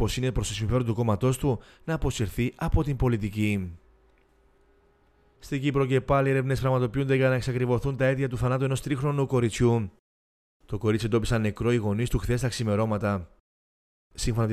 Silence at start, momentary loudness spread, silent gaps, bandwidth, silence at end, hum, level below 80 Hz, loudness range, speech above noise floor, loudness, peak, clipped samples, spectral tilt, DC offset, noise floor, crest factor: 0 s; 6 LU; 9.99-10.60 s, 13.40-14.10 s; 14.5 kHz; 0 s; none; -40 dBFS; 5 LU; 37 dB; -26 LUFS; -10 dBFS; under 0.1%; -6.5 dB/octave; under 0.1%; -62 dBFS; 16 dB